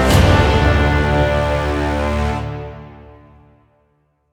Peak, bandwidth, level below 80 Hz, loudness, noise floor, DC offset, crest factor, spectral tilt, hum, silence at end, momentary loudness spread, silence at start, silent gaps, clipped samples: -2 dBFS; over 20 kHz; -24 dBFS; -16 LUFS; -62 dBFS; under 0.1%; 16 dB; -6 dB/octave; none; 1.3 s; 16 LU; 0 s; none; under 0.1%